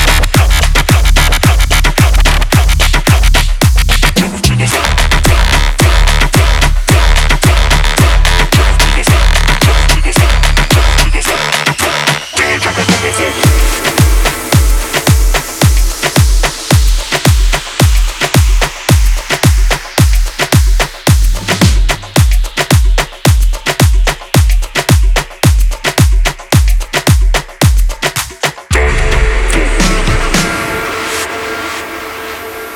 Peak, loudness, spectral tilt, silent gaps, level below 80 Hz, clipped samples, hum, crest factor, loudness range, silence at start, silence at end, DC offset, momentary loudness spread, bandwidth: 0 dBFS; -11 LUFS; -4 dB/octave; none; -12 dBFS; 0.3%; none; 8 dB; 3 LU; 0 s; 0 s; under 0.1%; 5 LU; 17.5 kHz